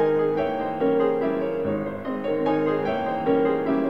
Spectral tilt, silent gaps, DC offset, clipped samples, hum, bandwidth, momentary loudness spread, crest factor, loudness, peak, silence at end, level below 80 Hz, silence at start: -8.5 dB/octave; none; 0.4%; under 0.1%; none; 5.4 kHz; 5 LU; 12 dB; -24 LUFS; -10 dBFS; 0 s; -56 dBFS; 0 s